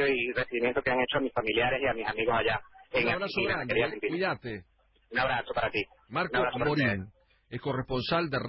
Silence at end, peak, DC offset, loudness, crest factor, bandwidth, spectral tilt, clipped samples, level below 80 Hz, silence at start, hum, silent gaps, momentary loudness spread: 0 s; -14 dBFS; under 0.1%; -29 LUFS; 16 dB; 5.8 kHz; -9.5 dB/octave; under 0.1%; -54 dBFS; 0 s; none; none; 8 LU